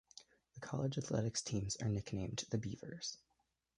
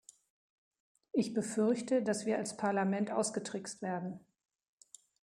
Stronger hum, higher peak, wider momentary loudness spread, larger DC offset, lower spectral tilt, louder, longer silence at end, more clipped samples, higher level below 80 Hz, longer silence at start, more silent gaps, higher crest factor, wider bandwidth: neither; about the same, -22 dBFS vs -20 dBFS; first, 18 LU vs 8 LU; neither; about the same, -5 dB/octave vs -5 dB/octave; second, -41 LUFS vs -35 LUFS; second, 0.6 s vs 1.2 s; neither; first, -62 dBFS vs -82 dBFS; second, 0.15 s vs 1.15 s; neither; about the same, 20 dB vs 18 dB; second, 11 kHz vs 14.5 kHz